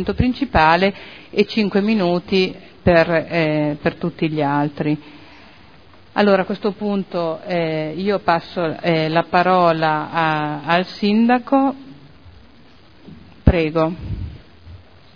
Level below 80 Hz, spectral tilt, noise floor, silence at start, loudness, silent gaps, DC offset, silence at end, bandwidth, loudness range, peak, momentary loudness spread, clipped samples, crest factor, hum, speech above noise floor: -36 dBFS; -8 dB/octave; -48 dBFS; 0 s; -18 LUFS; none; 0.4%; 0.4 s; 5.4 kHz; 4 LU; 0 dBFS; 8 LU; under 0.1%; 18 dB; none; 30 dB